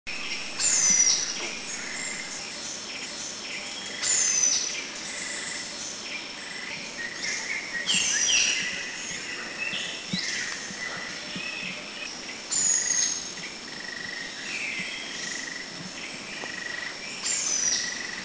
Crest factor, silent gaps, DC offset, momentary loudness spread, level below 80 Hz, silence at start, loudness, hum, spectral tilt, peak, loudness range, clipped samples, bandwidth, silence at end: 20 dB; none; under 0.1%; 14 LU; -64 dBFS; 0.05 s; -26 LUFS; none; 0.5 dB/octave; -10 dBFS; 6 LU; under 0.1%; 8 kHz; 0 s